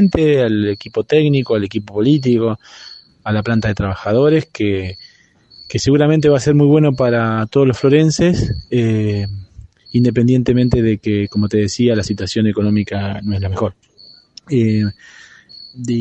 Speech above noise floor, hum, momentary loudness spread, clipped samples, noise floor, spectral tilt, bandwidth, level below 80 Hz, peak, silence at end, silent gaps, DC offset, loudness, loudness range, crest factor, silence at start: 33 dB; none; 10 LU; under 0.1%; -48 dBFS; -7 dB/octave; 8.6 kHz; -40 dBFS; 0 dBFS; 0 s; none; under 0.1%; -15 LUFS; 5 LU; 16 dB; 0 s